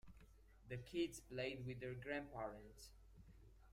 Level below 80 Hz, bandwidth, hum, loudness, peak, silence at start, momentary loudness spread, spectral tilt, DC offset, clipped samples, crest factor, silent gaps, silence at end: -66 dBFS; 16 kHz; none; -49 LUFS; -32 dBFS; 0.05 s; 22 LU; -5.5 dB/octave; under 0.1%; under 0.1%; 20 dB; none; 0 s